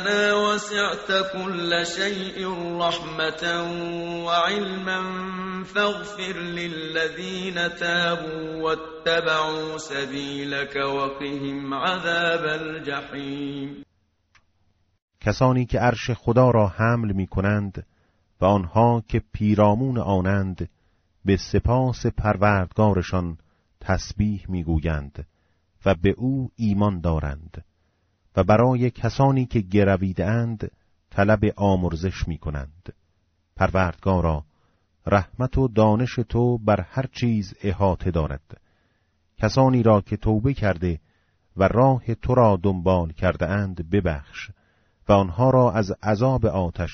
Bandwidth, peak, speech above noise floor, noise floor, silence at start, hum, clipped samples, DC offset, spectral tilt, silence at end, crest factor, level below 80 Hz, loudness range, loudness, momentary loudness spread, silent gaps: 8 kHz; -4 dBFS; 45 dB; -67 dBFS; 0 s; none; under 0.1%; under 0.1%; -5 dB/octave; 0 s; 18 dB; -40 dBFS; 4 LU; -23 LUFS; 11 LU; 15.02-15.08 s